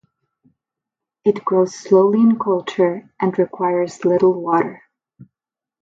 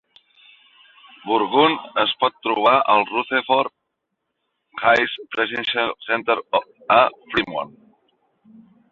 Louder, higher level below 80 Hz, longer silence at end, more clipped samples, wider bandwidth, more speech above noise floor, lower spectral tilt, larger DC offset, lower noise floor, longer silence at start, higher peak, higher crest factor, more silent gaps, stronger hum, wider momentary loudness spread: about the same, -18 LUFS vs -19 LUFS; second, -68 dBFS vs -62 dBFS; second, 1.05 s vs 1.25 s; neither; about the same, 7.8 kHz vs 7.4 kHz; first, 72 dB vs 57 dB; first, -7 dB/octave vs -5 dB/octave; neither; first, -88 dBFS vs -77 dBFS; about the same, 1.25 s vs 1.25 s; about the same, -2 dBFS vs -2 dBFS; about the same, 16 dB vs 20 dB; neither; neither; about the same, 7 LU vs 8 LU